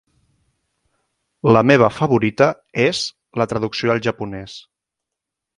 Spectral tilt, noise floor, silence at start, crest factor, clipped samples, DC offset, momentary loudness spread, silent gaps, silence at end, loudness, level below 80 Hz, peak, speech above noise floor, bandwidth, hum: -6 dB/octave; -83 dBFS; 1.45 s; 20 dB; under 0.1%; under 0.1%; 16 LU; none; 0.95 s; -17 LUFS; -52 dBFS; 0 dBFS; 66 dB; 11.5 kHz; none